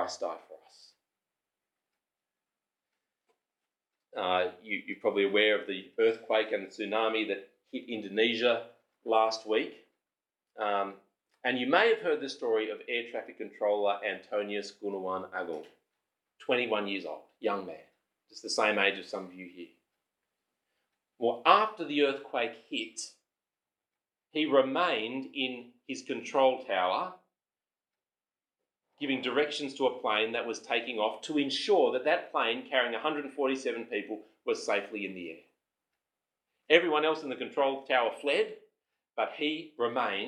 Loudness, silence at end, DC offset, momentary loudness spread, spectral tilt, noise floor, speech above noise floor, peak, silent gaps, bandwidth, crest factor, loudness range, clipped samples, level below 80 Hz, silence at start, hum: -30 LUFS; 0 s; under 0.1%; 14 LU; -3 dB/octave; under -90 dBFS; over 59 dB; -4 dBFS; none; 10.5 kHz; 28 dB; 5 LU; under 0.1%; under -90 dBFS; 0 s; none